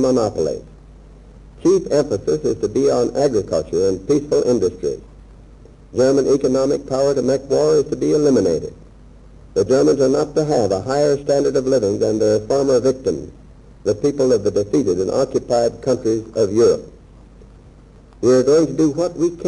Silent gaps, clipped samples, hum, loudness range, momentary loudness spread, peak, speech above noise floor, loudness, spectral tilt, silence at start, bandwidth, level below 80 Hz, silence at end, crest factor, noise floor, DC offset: none; under 0.1%; none; 2 LU; 8 LU; -4 dBFS; 27 dB; -18 LUFS; -6 dB/octave; 0 s; 11 kHz; -44 dBFS; 0 s; 12 dB; -44 dBFS; under 0.1%